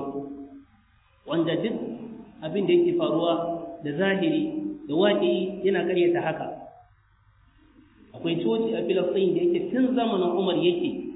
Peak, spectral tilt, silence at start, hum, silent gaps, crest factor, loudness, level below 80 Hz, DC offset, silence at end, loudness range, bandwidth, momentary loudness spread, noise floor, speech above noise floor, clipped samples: -10 dBFS; -10 dB/octave; 0 s; none; none; 16 dB; -25 LUFS; -64 dBFS; under 0.1%; 0 s; 4 LU; 4 kHz; 14 LU; -61 dBFS; 37 dB; under 0.1%